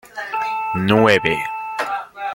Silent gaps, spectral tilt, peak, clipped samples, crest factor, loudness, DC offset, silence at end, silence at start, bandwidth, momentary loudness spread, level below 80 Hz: none; -5.5 dB/octave; 0 dBFS; under 0.1%; 20 dB; -19 LUFS; under 0.1%; 0 s; 0.15 s; 17 kHz; 12 LU; -54 dBFS